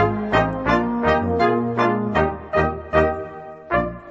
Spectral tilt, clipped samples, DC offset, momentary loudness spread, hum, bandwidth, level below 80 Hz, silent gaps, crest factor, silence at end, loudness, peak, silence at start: -7.5 dB/octave; under 0.1%; under 0.1%; 4 LU; none; 7.6 kHz; -38 dBFS; none; 16 dB; 0 s; -20 LUFS; -4 dBFS; 0 s